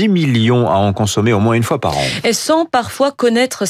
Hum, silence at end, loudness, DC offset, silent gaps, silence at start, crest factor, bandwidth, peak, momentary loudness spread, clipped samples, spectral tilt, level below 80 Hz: none; 0 s; -14 LUFS; under 0.1%; none; 0 s; 10 dB; 15.5 kHz; -4 dBFS; 4 LU; under 0.1%; -5 dB/octave; -46 dBFS